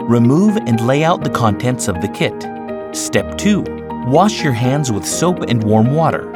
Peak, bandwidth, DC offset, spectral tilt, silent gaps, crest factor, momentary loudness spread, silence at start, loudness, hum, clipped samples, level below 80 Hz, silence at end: 0 dBFS; 16.5 kHz; under 0.1%; -5.5 dB/octave; none; 14 dB; 9 LU; 0 s; -15 LUFS; none; under 0.1%; -42 dBFS; 0 s